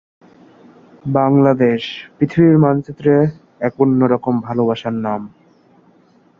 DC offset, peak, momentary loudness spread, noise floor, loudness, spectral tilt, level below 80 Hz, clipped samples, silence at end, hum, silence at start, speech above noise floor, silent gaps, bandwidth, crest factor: under 0.1%; 0 dBFS; 11 LU; -52 dBFS; -16 LUFS; -9.5 dB/octave; -54 dBFS; under 0.1%; 1.1 s; none; 1.05 s; 37 dB; none; 6.8 kHz; 16 dB